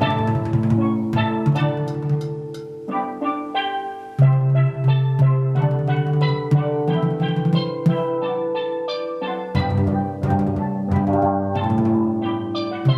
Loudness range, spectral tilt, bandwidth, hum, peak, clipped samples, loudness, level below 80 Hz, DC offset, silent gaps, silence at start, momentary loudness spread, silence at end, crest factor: 3 LU; -9 dB/octave; 6 kHz; none; -4 dBFS; under 0.1%; -21 LUFS; -48 dBFS; under 0.1%; none; 0 s; 8 LU; 0 s; 16 dB